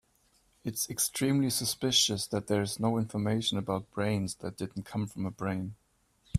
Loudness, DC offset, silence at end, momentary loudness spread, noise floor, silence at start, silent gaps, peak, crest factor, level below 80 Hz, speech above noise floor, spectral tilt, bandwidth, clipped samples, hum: -31 LUFS; under 0.1%; 0 s; 12 LU; -69 dBFS; 0.65 s; none; -12 dBFS; 20 dB; -64 dBFS; 38 dB; -4 dB/octave; 16 kHz; under 0.1%; none